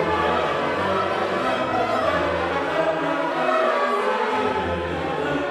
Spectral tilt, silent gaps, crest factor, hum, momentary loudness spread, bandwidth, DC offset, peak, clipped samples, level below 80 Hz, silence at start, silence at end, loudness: -5.5 dB/octave; none; 14 dB; none; 4 LU; 14 kHz; under 0.1%; -8 dBFS; under 0.1%; -48 dBFS; 0 s; 0 s; -22 LUFS